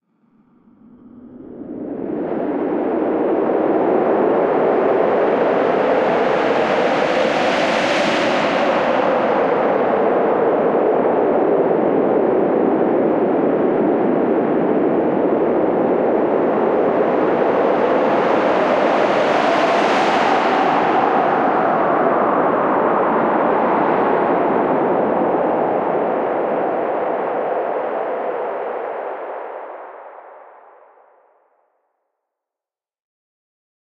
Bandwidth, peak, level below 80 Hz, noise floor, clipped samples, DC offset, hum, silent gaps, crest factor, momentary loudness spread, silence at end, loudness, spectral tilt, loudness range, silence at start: 9.8 kHz; -4 dBFS; -58 dBFS; -90 dBFS; under 0.1%; under 0.1%; none; none; 14 dB; 7 LU; 3.55 s; -17 LUFS; -6 dB/octave; 7 LU; 1.05 s